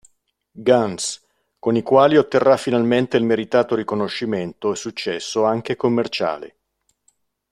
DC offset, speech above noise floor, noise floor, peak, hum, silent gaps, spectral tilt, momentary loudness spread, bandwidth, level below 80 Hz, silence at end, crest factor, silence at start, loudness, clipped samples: under 0.1%; 51 dB; -70 dBFS; -2 dBFS; none; none; -5 dB/octave; 11 LU; 12.5 kHz; -60 dBFS; 1.05 s; 18 dB; 0.55 s; -19 LUFS; under 0.1%